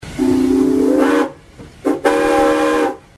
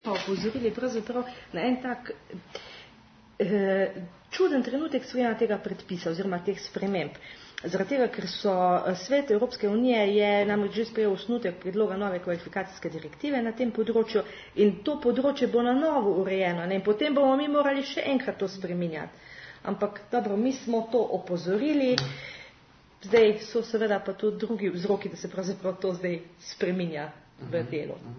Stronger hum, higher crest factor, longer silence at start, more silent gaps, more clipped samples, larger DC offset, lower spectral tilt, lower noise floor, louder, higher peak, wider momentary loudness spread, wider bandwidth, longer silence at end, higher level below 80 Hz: neither; second, 14 dB vs 24 dB; about the same, 0 s vs 0.05 s; neither; neither; neither; about the same, -5 dB/octave vs -6 dB/octave; second, -39 dBFS vs -56 dBFS; first, -15 LUFS vs -28 LUFS; about the same, -2 dBFS vs -4 dBFS; second, 6 LU vs 13 LU; first, 14 kHz vs 6.6 kHz; first, 0.2 s vs 0 s; first, -42 dBFS vs -64 dBFS